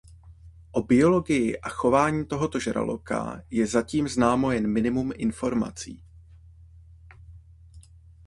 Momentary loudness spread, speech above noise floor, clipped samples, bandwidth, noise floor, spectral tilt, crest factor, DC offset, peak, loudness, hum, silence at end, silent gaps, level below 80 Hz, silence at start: 10 LU; 26 dB; under 0.1%; 11.5 kHz; -50 dBFS; -6 dB/octave; 20 dB; under 0.1%; -6 dBFS; -25 LUFS; none; 0.45 s; none; -48 dBFS; 0.25 s